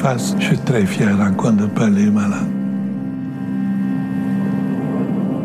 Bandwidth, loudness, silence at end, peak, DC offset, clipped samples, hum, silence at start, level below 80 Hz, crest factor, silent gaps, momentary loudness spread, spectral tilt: 13.5 kHz; -18 LUFS; 0 s; -4 dBFS; under 0.1%; under 0.1%; none; 0 s; -56 dBFS; 14 dB; none; 7 LU; -7 dB/octave